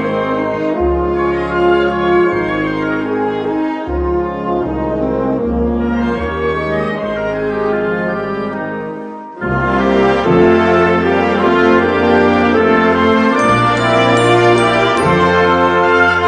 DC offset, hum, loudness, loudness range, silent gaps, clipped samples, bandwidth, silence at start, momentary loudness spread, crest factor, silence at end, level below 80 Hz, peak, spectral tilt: under 0.1%; none; -13 LUFS; 6 LU; none; under 0.1%; 9.8 kHz; 0 s; 8 LU; 12 dB; 0 s; -32 dBFS; 0 dBFS; -6.5 dB/octave